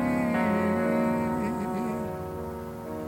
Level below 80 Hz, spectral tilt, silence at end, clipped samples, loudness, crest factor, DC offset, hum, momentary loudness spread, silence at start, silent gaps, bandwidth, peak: -52 dBFS; -7.5 dB/octave; 0 s; under 0.1%; -28 LUFS; 14 dB; under 0.1%; none; 11 LU; 0 s; none; 17 kHz; -14 dBFS